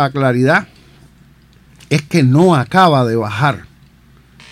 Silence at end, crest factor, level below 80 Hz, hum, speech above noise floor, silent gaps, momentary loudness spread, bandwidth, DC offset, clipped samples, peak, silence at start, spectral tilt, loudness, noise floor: 0.9 s; 14 dB; -50 dBFS; none; 34 dB; none; 7 LU; 14 kHz; under 0.1%; under 0.1%; 0 dBFS; 0 s; -6.5 dB/octave; -13 LUFS; -46 dBFS